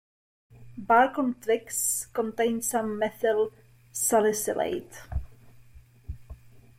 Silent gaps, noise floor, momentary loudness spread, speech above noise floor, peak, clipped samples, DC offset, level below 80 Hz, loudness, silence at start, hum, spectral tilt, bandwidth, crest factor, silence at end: none; -52 dBFS; 21 LU; 26 dB; -10 dBFS; under 0.1%; under 0.1%; -48 dBFS; -26 LUFS; 0.6 s; none; -3.5 dB/octave; 16.5 kHz; 18 dB; 0.2 s